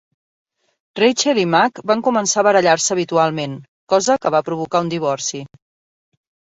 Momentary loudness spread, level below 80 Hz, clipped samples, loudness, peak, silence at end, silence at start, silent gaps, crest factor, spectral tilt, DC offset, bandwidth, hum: 11 LU; -62 dBFS; under 0.1%; -17 LUFS; -2 dBFS; 1.05 s; 0.95 s; 3.68-3.87 s; 16 dB; -3.5 dB/octave; under 0.1%; 8.2 kHz; none